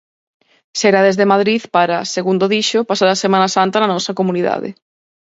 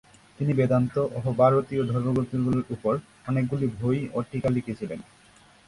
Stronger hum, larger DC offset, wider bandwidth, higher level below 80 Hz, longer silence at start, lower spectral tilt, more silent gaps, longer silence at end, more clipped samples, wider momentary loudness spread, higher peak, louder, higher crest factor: neither; neither; second, 8 kHz vs 11.5 kHz; second, -64 dBFS vs -54 dBFS; first, 0.75 s vs 0.4 s; second, -4 dB/octave vs -9 dB/octave; neither; second, 0.5 s vs 0.65 s; neither; second, 6 LU vs 9 LU; first, 0 dBFS vs -6 dBFS; first, -15 LUFS vs -26 LUFS; about the same, 16 dB vs 20 dB